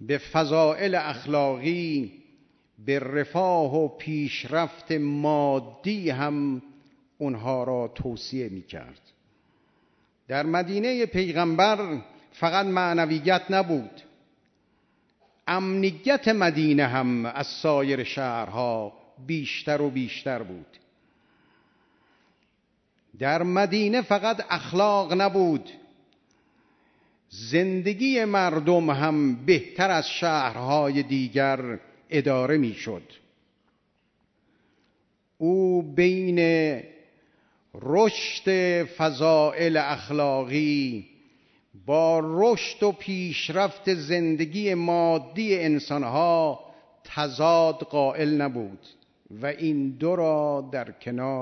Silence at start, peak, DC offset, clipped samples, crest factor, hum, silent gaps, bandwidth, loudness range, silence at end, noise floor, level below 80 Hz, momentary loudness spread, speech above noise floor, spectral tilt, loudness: 0 s; -6 dBFS; under 0.1%; under 0.1%; 20 dB; none; none; 6.4 kHz; 7 LU; 0 s; -70 dBFS; -64 dBFS; 11 LU; 46 dB; -6 dB/octave; -25 LUFS